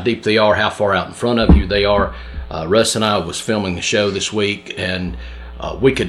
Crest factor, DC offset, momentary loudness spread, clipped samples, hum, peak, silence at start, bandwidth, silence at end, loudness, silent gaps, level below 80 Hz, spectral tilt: 16 dB; under 0.1%; 14 LU; under 0.1%; none; -2 dBFS; 0 s; 13 kHz; 0 s; -16 LUFS; none; -26 dBFS; -4.5 dB/octave